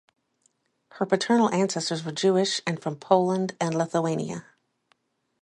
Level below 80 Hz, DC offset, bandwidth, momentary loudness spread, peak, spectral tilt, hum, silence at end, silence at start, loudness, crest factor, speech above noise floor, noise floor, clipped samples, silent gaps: -72 dBFS; under 0.1%; 11.5 kHz; 10 LU; -6 dBFS; -5 dB/octave; none; 1 s; 0.95 s; -25 LUFS; 22 dB; 45 dB; -70 dBFS; under 0.1%; none